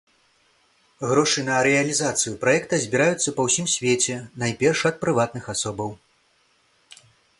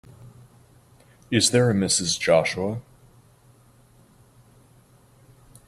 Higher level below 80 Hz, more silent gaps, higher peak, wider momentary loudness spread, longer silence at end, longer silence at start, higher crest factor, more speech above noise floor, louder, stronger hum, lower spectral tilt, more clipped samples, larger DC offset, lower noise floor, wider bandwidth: about the same, -60 dBFS vs -60 dBFS; neither; about the same, -4 dBFS vs -4 dBFS; second, 8 LU vs 11 LU; second, 1.45 s vs 2.85 s; first, 1 s vs 0.2 s; about the same, 20 dB vs 22 dB; first, 41 dB vs 34 dB; about the same, -22 LUFS vs -21 LUFS; neither; about the same, -3.5 dB/octave vs -3.5 dB/octave; neither; neither; first, -63 dBFS vs -55 dBFS; second, 11.5 kHz vs 15 kHz